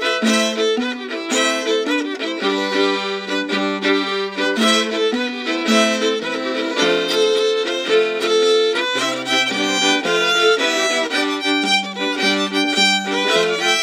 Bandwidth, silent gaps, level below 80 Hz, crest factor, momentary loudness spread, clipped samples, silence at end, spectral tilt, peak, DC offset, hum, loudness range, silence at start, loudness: 16 kHz; none; -72 dBFS; 16 dB; 6 LU; under 0.1%; 0 s; -2 dB/octave; -2 dBFS; under 0.1%; none; 3 LU; 0 s; -17 LUFS